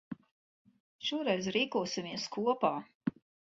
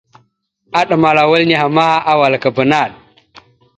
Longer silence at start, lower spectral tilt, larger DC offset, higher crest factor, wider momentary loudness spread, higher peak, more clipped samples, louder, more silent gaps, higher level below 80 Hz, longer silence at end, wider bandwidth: second, 0.1 s vs 0.75 s; second, -3 dB/octave vs -6 dB/octave; neither; first, 20 dB vs 14 dB; first, 9 LU vs 6 LU; second, -16 dBFS vs 0 dBFS; neither; second, -34 LUFS vs -12 LUFS; first, 0.31-0.65 s, 0.80-0.99 s, 2.95-3.01 s vs none; second, -74 dBFS vs -54 dBFS; second, 0.35 s vs 0.85 s; second, 7.6 kHz vs 9 kHz